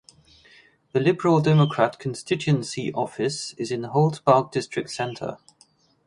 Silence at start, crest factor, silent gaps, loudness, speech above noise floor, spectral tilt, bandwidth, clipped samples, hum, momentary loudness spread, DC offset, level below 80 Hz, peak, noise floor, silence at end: 0.95 s; 22 dB; none; -23 LUFS; 37 dB; -6.5 dB/octave; 11 kHz; under 0.1%; none; 11 LU; under 0.1%; -62 dBFS; -2 dBFS; -60 dBFS; 0.7 s